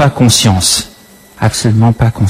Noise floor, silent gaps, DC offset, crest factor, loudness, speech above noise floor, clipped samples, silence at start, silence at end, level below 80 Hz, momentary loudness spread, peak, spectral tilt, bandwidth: -39 dBFS; none; under 0.1%; 10 dB; -10 LUFS; 29 dB; under 0.1%; 0 s; 0 s; -32 dBFS; 8 LU; 0 dBFS; -4.5 dB/octave; 16 kHz